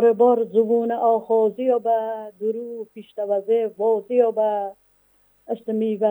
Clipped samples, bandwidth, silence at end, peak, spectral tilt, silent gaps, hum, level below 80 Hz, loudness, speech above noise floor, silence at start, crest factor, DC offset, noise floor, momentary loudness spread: under 0.1%; over 20 kHz; 0 s; -6 dBFS; -8.5 dB/octave; none; none; -74 dBFS; -21 LUFS; 38 dB; 0 s; 16 dB; under 0.1%; -59 dBFS; 12 LU